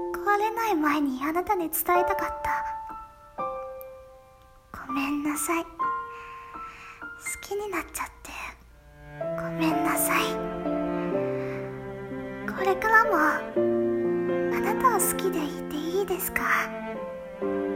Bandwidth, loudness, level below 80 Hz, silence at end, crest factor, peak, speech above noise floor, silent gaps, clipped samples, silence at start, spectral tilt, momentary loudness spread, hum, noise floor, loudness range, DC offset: 16.5 kHz; -27 LUFS; -54 dBFS; 0 s; 22 dB; -6 dBFS; 27 dB; none; under 0.1%; 0 s; -4 dB/octave; 16 LU; none; -53 dBFS; 9 LU; under 0.1%